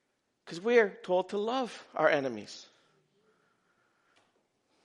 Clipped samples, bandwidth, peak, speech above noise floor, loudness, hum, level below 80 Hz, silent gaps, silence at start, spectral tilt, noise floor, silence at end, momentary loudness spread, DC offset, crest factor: under 0.1%; 11 kHz; -10 dBFS; 44 dB; -30 LUFS; none; -86 dBFS; none; 0.45 s; -4.5 dB/octave; -74 dBFS; 2.2 s; 19 LU; under 0.1%; 24 dB